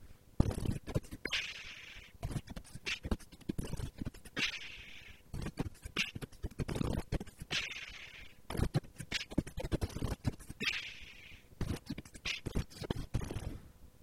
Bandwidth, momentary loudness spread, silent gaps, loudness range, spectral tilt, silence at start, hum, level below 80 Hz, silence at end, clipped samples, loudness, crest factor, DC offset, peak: 16.5 kHz; 13 LU; none; 2 LU; -4.5 dB/octave; 0 s; none; -48 dBFS; 0 s; under 0.1%; -40 LUFS; 30 dB; under 0.1%; -10 dBFS